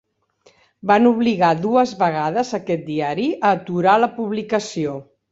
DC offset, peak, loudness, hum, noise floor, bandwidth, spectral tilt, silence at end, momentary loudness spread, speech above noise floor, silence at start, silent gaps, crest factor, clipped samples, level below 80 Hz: under 0.1%; -2 dBFS; -19 LUFS; none; -57 dBFS; 7.8 kHz; -6 dB/octave; 0.3 s; 10 LU; 39 dB; 0.85 s; none; 18 dB; under 0.1%; -62 dBFS